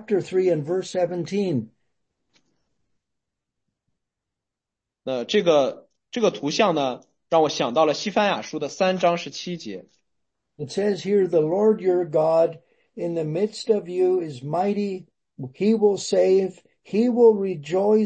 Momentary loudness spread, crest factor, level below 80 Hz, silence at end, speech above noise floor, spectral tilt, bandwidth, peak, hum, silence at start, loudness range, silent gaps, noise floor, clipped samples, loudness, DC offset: 12 LU; 18 dB; -72 dBFS; 0 s; 65 dB; -5.5 dB/octave; 8.8 kHz; -4 dBFS; none; 0 s; 7 LU; none; -86 dBFS; under 0.1%; -22 LUFS; under 0.1%